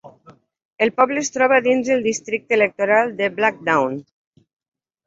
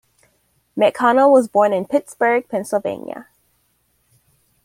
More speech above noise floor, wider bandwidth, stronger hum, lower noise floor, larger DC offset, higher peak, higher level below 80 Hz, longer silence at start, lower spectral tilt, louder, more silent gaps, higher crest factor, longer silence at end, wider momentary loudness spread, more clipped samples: second, 32 dB vs 48 dB; second, 7.8 kHz vs 15.5 kHz; neither; second, -50 dBFS vs -64 dBFS; neither; about the same, -2 dBFS vs -2 dBFS; about the same, -64 dBFS vs -66 dBFS; second, 0.05 s vs 0.75 s; second, -3.5 dB/octave vs -5 dB/octave; about the same, -18 LUFS vs -17 LUFS; first, 0.65-0.76 s vs none; about the same, 18 dB vs 16 dB; second, 1.05 s vs 1.4 s; second, 6 LU vs 18 LU; neither